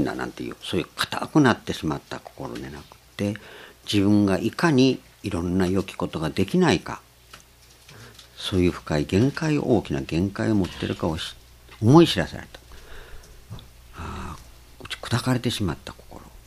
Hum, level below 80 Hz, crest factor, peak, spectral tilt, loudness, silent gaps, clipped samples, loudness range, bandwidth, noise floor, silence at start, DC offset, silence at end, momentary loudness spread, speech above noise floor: none; -46 dBFS; 24 dB; -2 dBFS; -6 dB/octave; -23 LUFS; none; under 0.1%; 7 LU; 15 kHz; -52 dBFS; 0 s; under 0.1%; 0.05 s; 23 LU; 29 dB